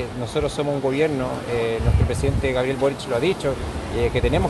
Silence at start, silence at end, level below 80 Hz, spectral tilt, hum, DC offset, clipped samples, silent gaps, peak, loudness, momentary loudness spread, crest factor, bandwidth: 0 s; 0 s; -30 dBFS; -6.5 dB/octave; none; under 0.1%; under 0.1%; none; -6 dBFS; -22 LUFS; 5 LU; 14 dB; 12.5 kHz